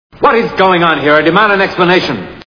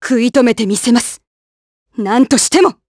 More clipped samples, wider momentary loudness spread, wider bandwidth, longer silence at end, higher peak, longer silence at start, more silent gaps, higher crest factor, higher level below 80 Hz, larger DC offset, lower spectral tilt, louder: first, 0.5% vs under 0.1%; second, 3 LU vs 12 LU; second, 5.4 kHz vs 11 kHz; about the same, 0.05 s vs 0.15 s; about the same, 0 dBFS vs 0 dBFS; first, 0.2 s vs 0 s; second, none vs 1.27-1.86 s; about the same, 10 dB vs 14 dB; first, -44 dBFS vs -52 dBFS; neither; first, -6.5 dB/octave vs -3.5 dB/octave; first, -9 LUFS vs -12 LUFS